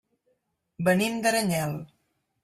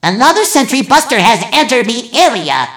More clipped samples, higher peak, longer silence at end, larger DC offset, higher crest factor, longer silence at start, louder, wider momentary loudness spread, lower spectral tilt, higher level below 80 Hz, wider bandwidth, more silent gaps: second, under 0.1% vs 1%; second, -10 dBFS vs 0 dBFS; first, 0.6 s vs 0 s; second, under 0.1% vs 0.1%; first, 20 dB vs 10 dB; first, 0.8 s vs 0.05 s; second, -25 LUFS vs -10 LUFS; first, 9 LU vs 4 LU; first, -4.5 dB/octave vs -2.5 dB/octave; second, -64 dBFS vs -50 dBFS; second, 15.5 kHz vs over 20 kHz; neither